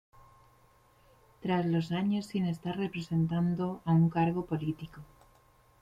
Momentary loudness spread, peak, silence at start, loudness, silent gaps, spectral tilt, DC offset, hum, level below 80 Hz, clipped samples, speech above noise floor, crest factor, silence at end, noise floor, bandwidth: 9 LU; -16 dBFS; 1.4 s; -31 LUFS; none; -8 dB/octave; under 0.1%; none; -62 dBFS; under 0.1%; 33 dB; 16 dB; 0.75 s; -63 dBFS; 7.8 kHz